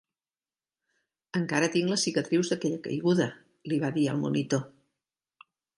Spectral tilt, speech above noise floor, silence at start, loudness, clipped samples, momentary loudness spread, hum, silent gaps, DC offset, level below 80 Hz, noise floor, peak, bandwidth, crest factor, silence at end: -5 dB/octave; over 63 dB; 1.35 s; -28 LUFS; under 0.1%; 7 LU; none; none; under 0.1%; -74 dBFS; under -90 dBFS; -10 dBFS; 11.5 kHz; 20 dB; 1.1 s